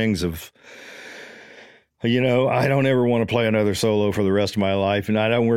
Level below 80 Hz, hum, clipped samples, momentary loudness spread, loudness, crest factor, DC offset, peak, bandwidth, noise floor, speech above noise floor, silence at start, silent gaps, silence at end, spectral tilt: -50 dBFS; none; under 0.1%; 20 LU; -20 LUFS; 16 dB; under 0.1%; -4 dBFS; 16.5 kHz; -48 dBFS; 28 dB; 0 s; none; 0 s; -6 dB/octave